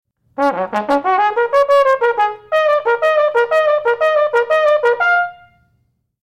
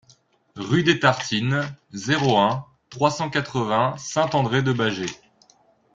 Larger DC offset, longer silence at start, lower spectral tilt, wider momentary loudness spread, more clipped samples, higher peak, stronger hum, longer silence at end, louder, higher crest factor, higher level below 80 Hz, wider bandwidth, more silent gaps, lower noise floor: neither; second, 0.4 s vs 0.55 s; about the same, -4 dB/octave vs -5 dB/octave; second, 6 LU vs 13 LU; neither; about the same, -4 dBFS vs -2 dBFS; neither; about the same, 0.9 s vs 0.8 s; first, -15 LUFS vs -22 LUFS; second, 12 dB vs 20 dB; about the same, -60 dBFS vs -58 dBFS; first, 10.5 kHz vs 7.8 kHz; neither; first, -63 dBFS vs -59 dBFS